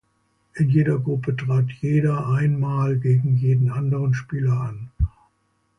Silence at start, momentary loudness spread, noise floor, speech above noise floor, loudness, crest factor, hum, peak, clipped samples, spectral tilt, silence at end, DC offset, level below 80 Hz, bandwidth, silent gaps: 0.55 s; 8 LU; -67 dBFS; 47 dB; -22 LUFS; 14 dB; none; -8 dBFS; under 0.1%; -9.5 dB/octave; 0.7 s; under 0.1%; -38 dBFS; 6.4 kHz; none